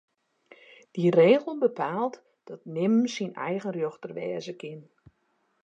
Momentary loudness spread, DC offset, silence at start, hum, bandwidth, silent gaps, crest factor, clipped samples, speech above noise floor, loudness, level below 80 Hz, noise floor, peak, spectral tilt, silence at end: 20 LU; under 0.1%; 0.95 s; none; 7.8 kHz; none; 20 dB; under 0.1%; 46 dB; -26 LUFS; -78 dBFS; -72 dBFS; -8 dBFS; -6.5 dB/octave; 0.85 s